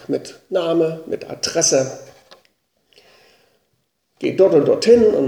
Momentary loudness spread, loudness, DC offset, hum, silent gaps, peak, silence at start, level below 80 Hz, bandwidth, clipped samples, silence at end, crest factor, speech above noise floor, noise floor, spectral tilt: 14 LU; -17 LUFS; under 0.1%; none; none; 0 dBFS; 0.1 s; -56 dBFS; 14.5 kHz; under 0.1%; 0 s; 18 dB; 52 dB; -69 dBFS; -4 dB/octave